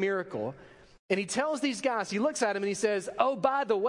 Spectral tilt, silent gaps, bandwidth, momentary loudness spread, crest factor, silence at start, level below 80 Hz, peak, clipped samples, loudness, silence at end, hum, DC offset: -4 dB/octave; 0.99-1.09 s; 11.5 kHz; 5 LU; 20 dB; 0 s; -70 dBFS; -10 dBFS; under 0.1%; -30 LUFS; 0 s; none; under 0.1%